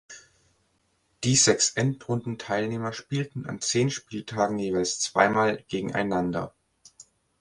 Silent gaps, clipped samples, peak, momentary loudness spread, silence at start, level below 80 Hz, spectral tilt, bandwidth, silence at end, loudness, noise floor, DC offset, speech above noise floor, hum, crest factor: none; under 0.1%; -4 dBFS; 12 LU; 0.1 s; -60 dBFS; -3.5 dB/octave; 11.5 kHz; 0.4 s; -26 LUFS; -70 dBFS; under 0.1%; 44 dB; none; 24 dB